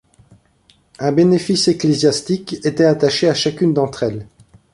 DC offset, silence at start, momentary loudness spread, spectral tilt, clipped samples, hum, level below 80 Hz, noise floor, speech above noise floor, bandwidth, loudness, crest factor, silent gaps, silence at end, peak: under 0.1%; 1 s; 9 LU; -5.5 dB/octave; under 0.1%; none; -52 dBFS; -55 dBFS; 40 dB; 11.5 kHz; -16 LUFS; 16 dB; none; 0.5 s; -2 dBFS